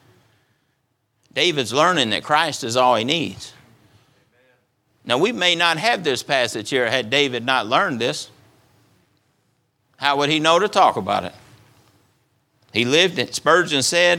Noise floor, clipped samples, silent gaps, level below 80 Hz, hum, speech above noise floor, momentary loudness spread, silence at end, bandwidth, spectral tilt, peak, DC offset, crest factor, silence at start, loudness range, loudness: -69 dBFS; under 0.1%; none; -66 dBFS; none; 50 dB; 9 LU; 0 s; 17 kHz; -3 dB/octave; 0 dBFS; under 0.1%; 20 dB; 1.35 s; 3 LU; -18 LUFS